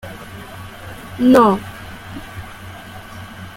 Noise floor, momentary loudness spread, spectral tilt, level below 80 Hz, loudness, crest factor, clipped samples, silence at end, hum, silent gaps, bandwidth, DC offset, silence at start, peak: -35 dBFS; 23 LU; -6.5 dB/octave; -46 dBFS; -14 LUFS; 18 dB; under 0.1%; 0.05 s; none; none; 16.5 kHz; under 0.1%; 0.05 s; -2 dBFS